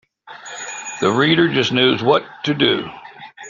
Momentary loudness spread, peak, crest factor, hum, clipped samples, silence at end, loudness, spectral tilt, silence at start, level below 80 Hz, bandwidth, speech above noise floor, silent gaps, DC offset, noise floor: 19 LU; -2 dBFS; 16 dB; none; under 0.1%; 0 s; -17 LUFS; -4.5 dB/octave; 0.25 s; -58 dBFS; 7.6 kHz; 22 dB; none; under 0.1%; -38 dBFS